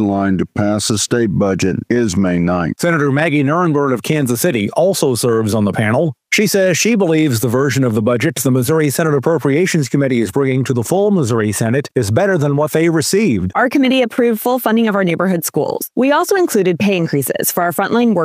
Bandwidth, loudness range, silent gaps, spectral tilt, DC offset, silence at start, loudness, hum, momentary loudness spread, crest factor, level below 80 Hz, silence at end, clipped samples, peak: 16 kHz; 1 LU; none; -5.5 dB/octave; under 0.1%; 0 s; -15 LUFS; none; 3 LU; 14 dB; -50 dBFS; 0 s; under 0.1%; 0 dBFS